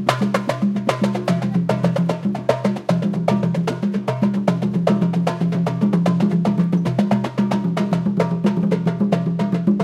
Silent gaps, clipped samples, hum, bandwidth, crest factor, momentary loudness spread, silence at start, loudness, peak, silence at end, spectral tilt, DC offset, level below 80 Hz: none; under 0.1%; none; 11.5 kHz; 18 dB; 3 LU; 0 s; -20 LUFS; 0 dBFS; 0 s; -8 dB/octave; under 0.1%; -56 dBFS